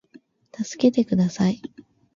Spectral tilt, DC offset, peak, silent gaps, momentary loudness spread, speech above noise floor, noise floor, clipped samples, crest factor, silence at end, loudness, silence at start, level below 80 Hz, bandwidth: -7 dB/octave; under 0.1%; -6 dBFS; none; 14 LU; 32 dB; -53 dBFS; under 0.1%; 18 dB; 0.6 s; -23 LUFS; 0.6 s; -60 dBFS; 7.6 kHz